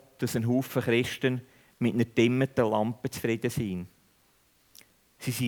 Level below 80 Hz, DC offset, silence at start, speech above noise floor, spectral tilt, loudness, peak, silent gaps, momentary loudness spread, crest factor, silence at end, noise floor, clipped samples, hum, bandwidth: -62 dBFS; under 0.1%; 0.2 s; 38 dB; -6 dB/octave; -28 LUFS; -10 dBFS; none; 10 LU; 20 dB; 0 s; -66 dBFS; under 0.1%; none; over 20 kHz